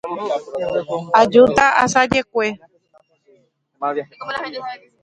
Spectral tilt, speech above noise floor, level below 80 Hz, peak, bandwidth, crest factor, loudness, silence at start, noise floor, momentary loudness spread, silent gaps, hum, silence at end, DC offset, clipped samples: -4 dB/octave; 40 dB; -52 dBFS; 0 dBFS; 9.6 kHz; 18 dB; -17 LUFS; 0.05 s; -58 dBFS; 16 LU; none; none; 0.25 s; under 0.1%; under 0.1%